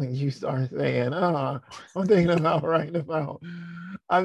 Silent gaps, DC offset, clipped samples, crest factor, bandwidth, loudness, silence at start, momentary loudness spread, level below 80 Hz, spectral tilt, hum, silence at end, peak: none; under 0.1%; under 0.1%; 18 dB; 10 kHz; -25 LUFS; 0 s; 17 LU; -58 dBFS; -8 dB/octave; none; 0 s; -8 dBFS